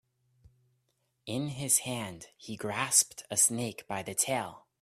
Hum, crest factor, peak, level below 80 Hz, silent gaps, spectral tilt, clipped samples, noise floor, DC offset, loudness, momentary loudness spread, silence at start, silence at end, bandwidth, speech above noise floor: none; 24 dB; -8 dBFS; -70 dBFS; none; -2 dB/octave; under 0.1%; -77 dBFS; under 0.1%; -29 LUFS; 18 LU; 1.25 s; 0.25 s; 15.5 kHz; 45 dB